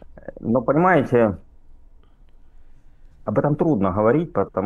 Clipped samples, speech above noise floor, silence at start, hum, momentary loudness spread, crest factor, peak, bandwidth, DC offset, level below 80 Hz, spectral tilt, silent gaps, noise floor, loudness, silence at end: under 0.1%; 29 dB; 0.1 s; none; 15 LU; 18 dB; -4 dBFS; 7 kHz; under 0.1%; -46 dBFS; -10 dB/octave; none; -47 dBFS; -20 LUFS; 0 s